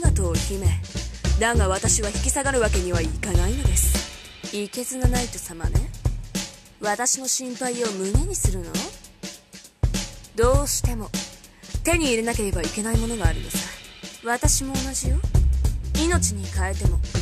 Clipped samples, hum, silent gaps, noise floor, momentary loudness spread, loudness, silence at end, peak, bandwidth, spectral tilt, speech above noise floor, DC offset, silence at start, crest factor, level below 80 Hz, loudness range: under 0.1%; none; none; -46 dBFS; 12 LU; -24 LUFS; 0 s; -4 dBFS; 14.5 kHz; -4 dB/octave; 24 dB; under 0.1%; 0 s; 18 dB; -26 dBFS; 4 LU